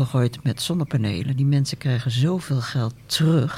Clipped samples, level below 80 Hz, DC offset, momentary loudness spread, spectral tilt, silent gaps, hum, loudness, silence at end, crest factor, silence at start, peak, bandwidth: under 0.1%; -54 dBFS; under 0.1%; 5 LU; -6 dB/octave; none; none; -23 LUFS; 0 s; 14 dB; 0 s; -8 dBFS; 15.5 kHz